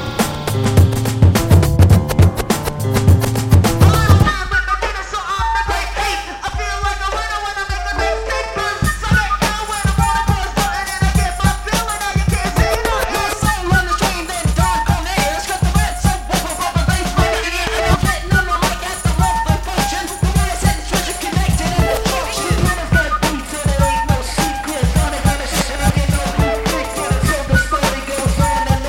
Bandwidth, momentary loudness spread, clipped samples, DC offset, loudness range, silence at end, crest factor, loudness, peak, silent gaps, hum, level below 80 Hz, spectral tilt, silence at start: 17 kHz; 6 LU; under 0.1%; under 0.1%; 5 LU; 0 s; 14 dB; -16 LUFS; 0 dBFS; none; none; -22 dBFS; -4.5 dB/octave; 0 s